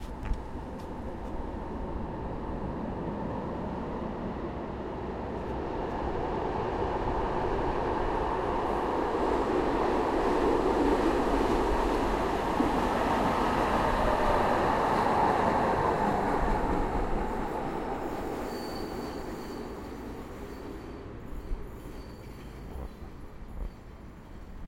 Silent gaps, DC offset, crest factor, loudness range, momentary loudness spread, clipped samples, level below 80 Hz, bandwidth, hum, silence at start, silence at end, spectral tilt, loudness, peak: none; under 0.1%; 18 dB; 15 LU; 17 LU; under 0.1%; -40 dBFS; 16.5 kHz; none; 0 s; 0 s; -6.5 dB/octave; -30 LUFS; -12 dBFS